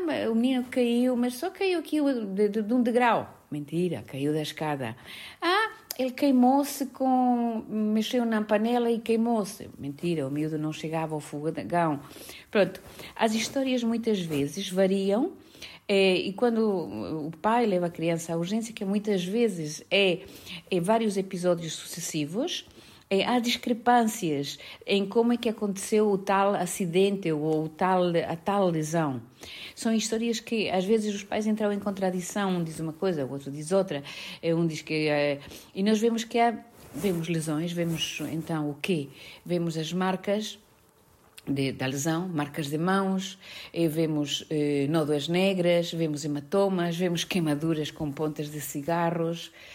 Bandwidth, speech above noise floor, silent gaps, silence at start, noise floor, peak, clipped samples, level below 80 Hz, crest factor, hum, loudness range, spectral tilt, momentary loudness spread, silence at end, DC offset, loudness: 16 kHz; 33 dB; none; 0 s; -60 dBFS; -10 dBFS; under 0.1%; -66 dBFS; 18 dB; none; 4 LU; -5 dB/octave; 9 LU; 0 s; under 0.1%; -27 LUFS